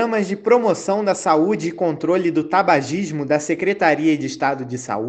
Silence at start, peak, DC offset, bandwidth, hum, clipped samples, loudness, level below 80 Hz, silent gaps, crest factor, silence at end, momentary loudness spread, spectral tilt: 0 s; -2 dBFS; under 0.1%; 9 kHz; none; under 0.1%; -19 LUFS; -62 dBFS; none; 18 dB; 0 s; 6 LU; -5.5 dB/octave